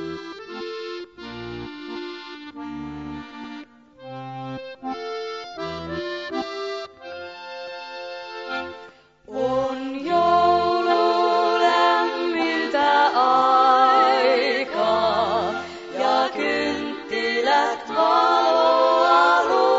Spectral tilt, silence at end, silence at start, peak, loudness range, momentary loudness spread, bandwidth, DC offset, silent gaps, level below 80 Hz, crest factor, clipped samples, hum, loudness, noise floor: -4.5 dB/octave; 0 s; 0 s; -4 dBFS; 16 LU; 19 LU; 7.8 kHz; under 0.1%; none; -58 dBFS; 18 dB; under 0.1%; none; -20 LUFS; -46 dBFS